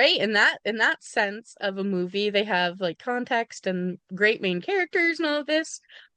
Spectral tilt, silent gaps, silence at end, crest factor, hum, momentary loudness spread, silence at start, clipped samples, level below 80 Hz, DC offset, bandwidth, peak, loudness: -4 dB/octave; none; 0.2 s; 18 dB; none; 10 LU; 0 s; under 0.1%; -78 dBFS; under 0.1%; 10 kHz; -8 dBFS; -24 LUFS